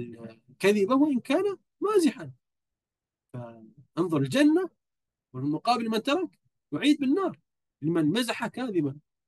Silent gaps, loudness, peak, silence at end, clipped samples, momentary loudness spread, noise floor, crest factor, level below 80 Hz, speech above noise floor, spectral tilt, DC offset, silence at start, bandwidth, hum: none; -27 LUFS; -10 dBFS; 0.3 s; under 0.1%; 20 LU; under -90 dBFS; 18 dB; -76 dBFS; over 64 dB; -5.5 dB/octave; under 0.1%; 0 s; 12.5 kHz; none